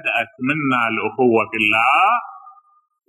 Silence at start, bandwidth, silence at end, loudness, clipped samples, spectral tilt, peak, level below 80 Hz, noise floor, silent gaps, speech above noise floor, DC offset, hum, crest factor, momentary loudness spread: 0.05 s; 13.5 kHz; 0.6 s; -17 LUFS; under 0.1%; -5.5 dB/octave; -4 dBFS; -64 dBFS; -46 dBFS; none; 29 dB; under 0.1%; none; 16 dB; 8 LU